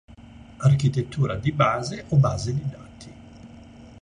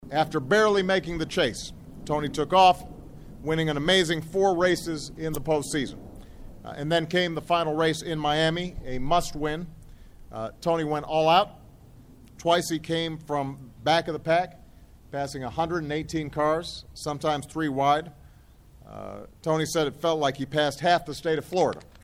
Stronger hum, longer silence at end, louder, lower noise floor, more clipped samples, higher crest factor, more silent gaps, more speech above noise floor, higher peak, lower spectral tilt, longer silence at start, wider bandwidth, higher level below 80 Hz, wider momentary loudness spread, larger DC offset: neither; about the same, 0.1 s vs 0.2 s; first, -23 LUFS vs -26 LUFS; second, -45 dBFS vs -52 dBFS; neither; about the same, 18 dB vs 20 dB; neither; second, 23 dB vs 27 dB; about the same, -6 dBFS vs -6 dBFS; first, -7 dB/octave vs -4.5 dB/octave; about the same, 0.1 s vs 0 s; second, 10 kHz vs 17 kHz; about the same, -46 dBFS vs -46 dBFS; first, 22 LU vs 15 LU; neither